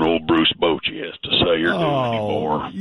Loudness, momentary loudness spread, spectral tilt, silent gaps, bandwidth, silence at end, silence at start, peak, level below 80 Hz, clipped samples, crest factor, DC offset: -19 LUFS; 7 LU; -7 dB/octave; none; 10.5 kHz; 0 s; 0 s; -6 dBFS; -46 dBFS; under 0.1%; 14 dB; under 0.1%